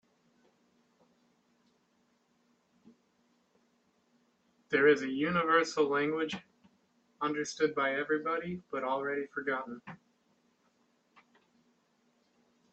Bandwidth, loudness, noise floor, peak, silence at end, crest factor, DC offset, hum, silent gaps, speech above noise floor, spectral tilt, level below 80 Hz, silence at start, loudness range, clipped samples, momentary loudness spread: 8.4 kHz; -31 LUFS; -73 dBFS; -12 dBFS; 2.8 s; 24 dB; under 0.1%; none; none; 42 dB; -4.5 dB/octave; -78 dBFS; 4.7 s; 10 LU; under 0.1%; 11 LU